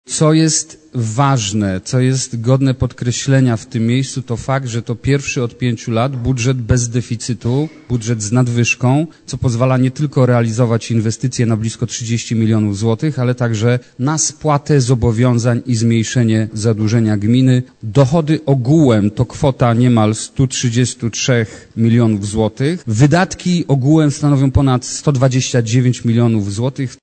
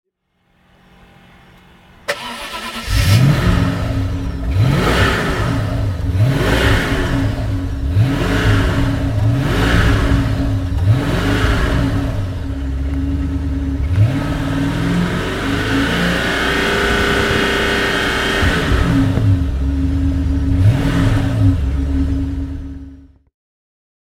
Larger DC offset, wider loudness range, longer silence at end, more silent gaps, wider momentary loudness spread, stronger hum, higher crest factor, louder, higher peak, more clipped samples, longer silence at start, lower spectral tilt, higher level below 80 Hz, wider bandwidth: neither; about the same, 3 LU vs 4 LU; second, 0.05 s vs 0.95 s; neither; about the same, 6 LU vs 8 LU; neither; about the same, 12 dB vs 16 dB; about the same, -15 LUFS vs -16 LUFS; about the same, -2 dBFS vs 0 dBFS; neither; second, 0.1 s vs 2.1 s; about the same, -6 dB/octave vs -6 dB/octave; second, -38 dBFS vs -22 dBFS; second, 9 kHz vs 16 kHz